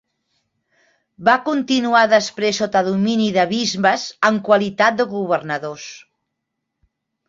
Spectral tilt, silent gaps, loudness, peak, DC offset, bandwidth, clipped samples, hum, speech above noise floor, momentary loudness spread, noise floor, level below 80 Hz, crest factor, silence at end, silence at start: -4 dB/octave; none; -17 LUFS; -2 dBFS; under 0.1%; 7.8 kHz; under 0.1%; none; 60 dB; 7 LU; -78 dBFS; -62 dBFS; 18 dB; 1.3 s; 1.2 s